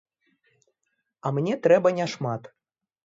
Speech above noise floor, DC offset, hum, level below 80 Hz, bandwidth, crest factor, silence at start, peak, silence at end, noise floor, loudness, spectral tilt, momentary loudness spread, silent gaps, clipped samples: 55 dB; under 0.1%; none; -72 dBFS; 7.8 kHz; 20 dB; 1.25 s; -8 dBFS; 0.6 s; -78 dBFS; -24 LUFS; -6.5 dB/octave; 13 LU; none; under 0.1%